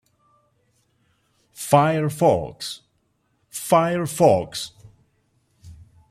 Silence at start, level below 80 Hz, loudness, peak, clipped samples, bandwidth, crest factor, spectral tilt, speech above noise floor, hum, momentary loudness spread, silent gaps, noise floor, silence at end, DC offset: 1.6 s; -58 dBFS; -20 LUFS; -2 dBFS; under 0.1%; 16 kHz; 20 dB; -5.5 dB/octave; 49 dB; none; 17 LU; none; -68 dBFS; 0.35 s; under 0.1%